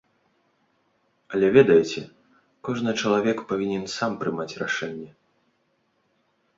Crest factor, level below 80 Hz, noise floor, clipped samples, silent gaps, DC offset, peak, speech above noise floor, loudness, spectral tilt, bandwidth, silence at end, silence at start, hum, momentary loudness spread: 22 dB; -64 dBFS; -70 dBFS; under 0.1%; none; under 0.1%; -4 dBFS; 47 dB; -23 LUFS; -5.5 dB/octave; 7.8 kHz; 1.5 s; 1.3 s; none; 18 LU